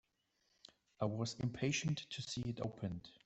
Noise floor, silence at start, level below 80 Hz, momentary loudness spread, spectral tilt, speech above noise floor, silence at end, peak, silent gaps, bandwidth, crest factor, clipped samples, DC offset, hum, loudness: -81 dBFS; 1 s; -68 dBFS; 6 LU; -5 dB/octave; 40 dB; 0.15 s; -22 dBFS; none; 8.2 kHz; 20 dB; under 0.1%; under 0.1%; none; -41 LUFS